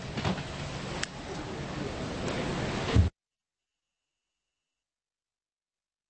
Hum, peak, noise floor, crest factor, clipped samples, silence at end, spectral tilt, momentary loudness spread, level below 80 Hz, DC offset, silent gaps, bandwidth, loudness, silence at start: none; -12 dBFS; under -90 dBFS; 24 dB; under 0.1%; 3 s; -5.5 dB/octave; 10 LU; -42 dBFS; under 0.1%; none; 8.4 kHz; -33 LUFS; 0 s